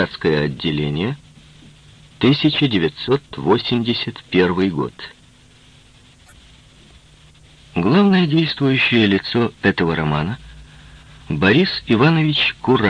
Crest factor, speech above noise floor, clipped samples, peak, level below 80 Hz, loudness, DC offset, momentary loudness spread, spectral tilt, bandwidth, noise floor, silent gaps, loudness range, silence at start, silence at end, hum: 18 dB; 32 dB; under 0.1%; 0 dBFS; -46 dBFS; -17 LUFS; under 0.1%; 11 LU; -7.5 dB/octave; 10 kHz; -49 dBFS; none; 7 LU; 0 s; 0 s; none